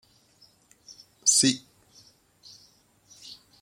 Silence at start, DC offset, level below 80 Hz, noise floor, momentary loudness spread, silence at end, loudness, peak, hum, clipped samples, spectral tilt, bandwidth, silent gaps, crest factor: 0.9 s; under 0.1%; -74 dBFS; -61 dBFS; 26 LU; 0.3 s; -22 LUFS; -8 dBFS; none; under 0.1%; -1.5 dB/octave; 16.5 kHz; none; 24 dB